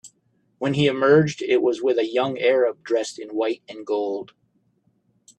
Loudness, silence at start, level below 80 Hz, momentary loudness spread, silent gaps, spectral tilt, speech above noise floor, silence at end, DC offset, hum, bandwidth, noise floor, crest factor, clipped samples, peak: -22 LUFS; 0.05 s; -64 dBFS; 12 LU; none; -6 dB/octave; 45 dB; 1.15 s; under 0.1%; none; 9.8 kHz; -66 dBFS; 18 dB; under 0.1%; -4 dBFS